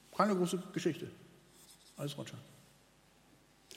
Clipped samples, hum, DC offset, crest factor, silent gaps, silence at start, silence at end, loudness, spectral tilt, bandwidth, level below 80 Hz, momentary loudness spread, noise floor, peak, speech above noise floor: under 0.1%; none; under 0.1%; 26 dB; none; 0.1 s; 0 s; -37 LUFS; -5.5 dB/octave; 16 kHz; -78 dBFS; 27 LU; -66 dBFS; -12 dBFS; 30 dB